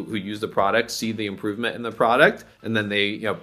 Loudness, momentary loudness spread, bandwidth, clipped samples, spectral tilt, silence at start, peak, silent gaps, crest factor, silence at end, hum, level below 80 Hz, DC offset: -22 LUFS; 11 LU; 15 kHz; under 0.1%; -4.5 dB/octave; 0 s; -2 dBFS; none; 22 dB; 0 s; none; -62 dBFS; under 0.1%